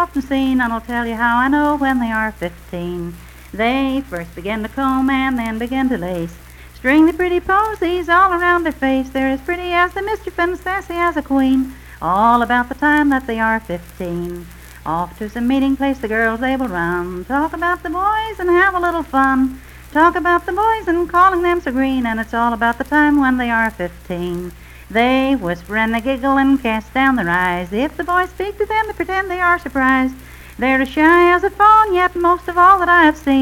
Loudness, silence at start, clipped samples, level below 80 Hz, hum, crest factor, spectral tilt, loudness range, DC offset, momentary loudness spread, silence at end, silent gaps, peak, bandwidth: -16 LUFS; 0 s; under 0.1%; -38 dBFS; none; 16 dB; -6 dB/octave; 6 LU; under 0.1%; 12 LU; 0 s; none; 0 dBFS; 17 kHz